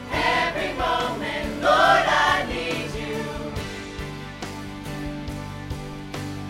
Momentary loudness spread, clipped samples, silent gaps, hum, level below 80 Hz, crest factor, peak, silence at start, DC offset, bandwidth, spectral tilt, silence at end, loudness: 16 LU; under 0.1%; none; none; -42 dBFS; 20 dB; -4 dBFS; 0 s; under 0.1%; 16 kHz; -4 dB/octave; 0 s; -24 LUFS